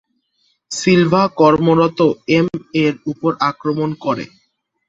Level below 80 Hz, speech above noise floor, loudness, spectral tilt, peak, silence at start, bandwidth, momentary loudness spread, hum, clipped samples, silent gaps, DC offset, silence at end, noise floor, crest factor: -54 dBFS; 49 dB; -16 LUFS; -6 dB/octave; -2 dBFS; 0.7 s; 8 kHz; 9 LU; none; under 0.1%; none; under 0.1%; 0.65 s; -64 dBFS; 14 dB